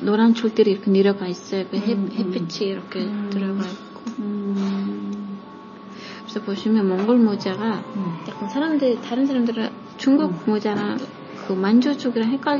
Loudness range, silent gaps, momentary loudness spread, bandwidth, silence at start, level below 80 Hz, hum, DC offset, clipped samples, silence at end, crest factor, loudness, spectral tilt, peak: 6 LU; none; 14 LU; 7.2 kHz; 0 s; -70 dBFS; none; under 0.1%; under 0.1%; 0 s; 16 dB; -22 LUFS; -7 dB/octave; -6 dBFS